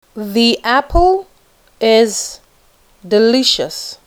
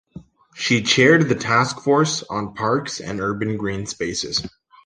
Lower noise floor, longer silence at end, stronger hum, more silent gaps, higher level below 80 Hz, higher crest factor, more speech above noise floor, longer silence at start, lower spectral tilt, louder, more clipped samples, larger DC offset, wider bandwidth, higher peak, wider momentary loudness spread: first, -51 dBFS vs -43 dBFS; second, 0.1 s vs 0.35 s; neither; neither; first, -30 dBFS vs -52 dBFS; about the same, 16 dB vs 18 dB; first, 38 dB vs 23 dB; about the same, 0.15 s vs 0.15 s; about the same, -3 dB/octave vs -4 dB/octave; first, -13 LUFS vs -20 LUFS; neither; neither; first, 19.5 kHz vs 10.5 kHz; about the same, 0 dBFS vs -2 dBFS; second, 9 LU vs 12 LU